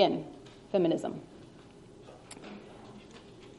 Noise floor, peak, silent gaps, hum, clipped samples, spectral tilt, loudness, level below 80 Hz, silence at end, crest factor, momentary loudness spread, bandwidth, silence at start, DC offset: -53 dBFS; -8 dBFS; none; none; under 0.1%; -6 dB/octave; -32 LUFS; -66 dBFS; 0.05 s; 26 dB; 24 LU; 11.5 kHz; 0 s; under 0.1%